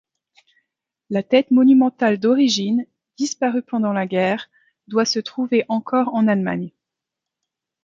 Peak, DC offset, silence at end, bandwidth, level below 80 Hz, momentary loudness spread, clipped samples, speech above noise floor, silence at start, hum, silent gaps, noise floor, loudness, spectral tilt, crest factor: -2 dBFS; under 0.1%; 1.15 s; 7.6 kHz; -68 dBFS; 12 LU; under 0.1%; 66 dB; 1.1 s; none; none; -84 dBFS; -19 LUFS; -5 dB/octave; 18 dB